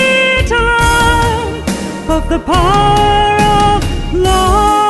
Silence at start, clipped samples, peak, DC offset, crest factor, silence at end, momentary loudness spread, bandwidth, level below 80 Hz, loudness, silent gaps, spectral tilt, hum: 0 s; under 0.1%; 0 dBFS; under 0.1%; 10 dB; 0 s; 7 LU; 12.5 kHz; -20 dBFS; -11 LUFS; none; -4.5 dB/octave; none